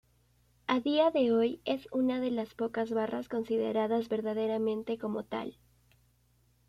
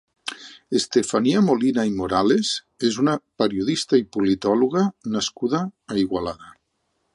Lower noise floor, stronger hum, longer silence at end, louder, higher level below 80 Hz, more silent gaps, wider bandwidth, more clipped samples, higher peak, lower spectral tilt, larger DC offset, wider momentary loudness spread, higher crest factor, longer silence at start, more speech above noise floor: about the same, -69 dBFS vs -72 dBFS; first, 60 Hz at -60 dBFS vs none; first, 1.15 s vs 0.65 s; second, -32 LUFS vs -22 LUFS; second, -68 dBFS vs -54 dBFS; neither; first, 13.5 kHz vs 11.5 kHz; neither; second, -16 dBFS vs -4 dBFS; first, -6.5 dB/octave vs -5 dB/octave; neither; about the same, 9 LU vs 9 LU; about the same, 18 dB vs 18 dB; first, 0.7 s vs 0.25 s; second, 38 dB vs 51 dB